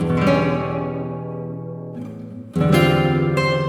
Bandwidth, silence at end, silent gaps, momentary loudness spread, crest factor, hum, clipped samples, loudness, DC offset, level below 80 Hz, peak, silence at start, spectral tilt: 16 kHz; 0 s; none; 16 LU; 16 dB; none; under 0.1%; -20 LUFS; under 0.1%; -44 dBFS; -2 dBFS; 0 s; -7 dB/octave